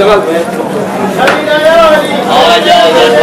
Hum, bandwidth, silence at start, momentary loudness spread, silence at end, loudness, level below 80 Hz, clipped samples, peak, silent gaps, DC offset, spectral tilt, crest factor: none; 19 kHz; 0 s; 8 LU; 0 s; -7 LUFS; -40 dBFS; 8%; 0 dBFS; none; under 0.1%; -4 dB/octave; 6 dB